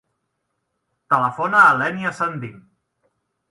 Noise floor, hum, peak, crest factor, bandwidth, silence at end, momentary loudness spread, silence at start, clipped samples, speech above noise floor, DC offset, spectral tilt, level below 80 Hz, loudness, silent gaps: -75 dBFS; none; 0 dBFS; 20 dB; 11.5 kHz; 0.9 s; 15 LU; 1.1 s; under 0.1%; 57 dB; under 0.1%; -5.5 dB/octave; -66 dBFS; -17 LUFS; none